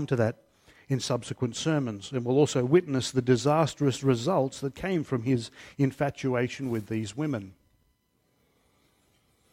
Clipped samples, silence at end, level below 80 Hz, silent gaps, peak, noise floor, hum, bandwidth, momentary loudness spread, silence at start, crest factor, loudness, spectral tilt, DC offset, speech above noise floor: under 0.1%; 2 s; -62 dBFS; none; -10 dBFS; -71 dBFS; none; 15.5 kHz; 9 LU; 0 s; 18 dB; -28 LUFS; -6 dB/octave; under 0.1%; 44 dB